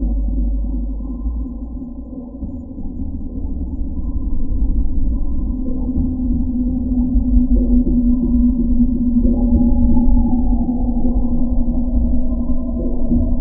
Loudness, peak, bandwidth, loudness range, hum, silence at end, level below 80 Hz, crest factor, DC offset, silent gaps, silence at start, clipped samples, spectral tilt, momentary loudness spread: -19 LUFS; -2 dBFS; 1.1 kHz; 11 LU; none; 0 s; -18 dBFS; 14 dB; under 0.1%; none; 0 s; under 0.1%; -17 dB/octave; 12 LU